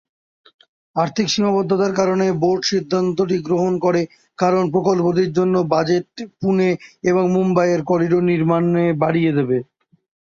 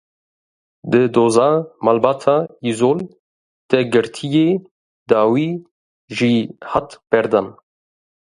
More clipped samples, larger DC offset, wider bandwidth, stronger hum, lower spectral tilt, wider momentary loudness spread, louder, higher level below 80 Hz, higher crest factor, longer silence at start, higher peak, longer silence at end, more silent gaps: neither; neither; second, 7.4 kHz vs 11 kHz; neither; about the same, -6.5 dB/octave vs -6 dB/octave; second, 5 LU vs 9 LU; about the same, -18 LUFS vs -17 LUFS; about the same, -58 dBFS vs -58 dBFS; about the same, 16 dB vs 18 dB; about the same, 0.95 s vs 0.85 s; about the same, -2 dBFS vs 0 dBFS; second, 0.65 s vs 0.85 s; second, none vs 3.19-3.69 s, 4.71-5.06 s, 5.71-6.08 s